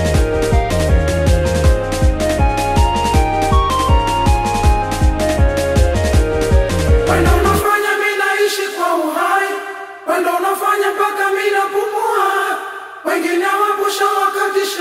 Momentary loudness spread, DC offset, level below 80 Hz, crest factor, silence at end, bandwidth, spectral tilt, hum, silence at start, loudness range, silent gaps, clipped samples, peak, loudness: 4 LU; under 0.1%; -20 dBFS; 12 dB; 0 s; 16 kHz; -5.5 dB/octave; none; 0 s; 2 LU; none; under 0.1%; -2 dBFS; -15 LUFS